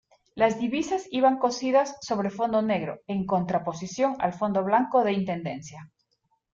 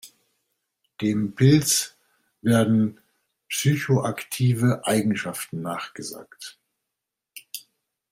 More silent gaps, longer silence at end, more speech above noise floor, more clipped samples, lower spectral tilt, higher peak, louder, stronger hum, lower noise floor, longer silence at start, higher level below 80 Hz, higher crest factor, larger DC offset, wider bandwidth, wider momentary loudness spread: neither; first, 0.7 s vs 0.5 s; second, 48 dB vs 62 dB; neither; about the same, -5.5 dB/octave vs -5 dB/octave; second, -8 dBFS vs -4 dBFS; second, -26 LUFS vs -23 LUFS; neither; second, -73 dBFS vs -85 dBFS; first, 0.35 s vs 0.05 s; about the same, -64 dBFS vs -62 dBFS; about the same, 18 dB vs 20 dB; neither; second, 7.8 kHz vs 16 kHz; second, 9 LU vs 19 LU